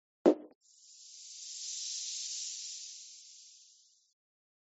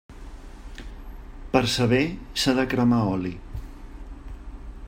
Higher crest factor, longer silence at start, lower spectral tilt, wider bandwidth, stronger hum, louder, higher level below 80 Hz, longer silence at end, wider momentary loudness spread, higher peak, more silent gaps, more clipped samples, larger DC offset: first, 30 dB vs 22 dB; first, 0.25 s vs 0.1 s; second, -3 dB/octave vs -5.5 dB/octave; second, 8 kHz vs 16 kHz; neither; second, -36 LUFS vs -23 LUFS; second, under -90 dBFS vs -40 dBFS; first, 1 s vs 0 s; about the same, 25 LU vs 23 LU; second, -10 dBFS vs -4 dBFS; first, 0.55-0.61 s vs none; neither; neither